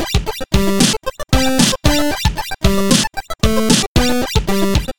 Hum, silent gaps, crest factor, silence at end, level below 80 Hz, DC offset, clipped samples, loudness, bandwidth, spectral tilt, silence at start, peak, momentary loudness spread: none; 3.87-3.95 s; 16 dB; 0 s; -24 dBFS; 5%; under 0.1%; -15 LUFS; 19.5 kHz; -4 dB/octave; 0 s; 0 dBFS; 6 LU